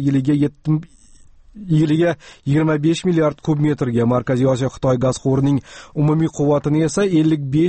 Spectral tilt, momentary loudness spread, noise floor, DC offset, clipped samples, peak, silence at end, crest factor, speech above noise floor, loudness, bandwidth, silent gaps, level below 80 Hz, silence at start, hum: -7.5 dB/octave; 5 LU; -46 dBFS; under 0.1%; under 0.1%; -6 dBFS; 0 s; 12 dB; 28 dB; -18 LUFS; 8.8 kHz; none; -46 dBFS; 0 s; none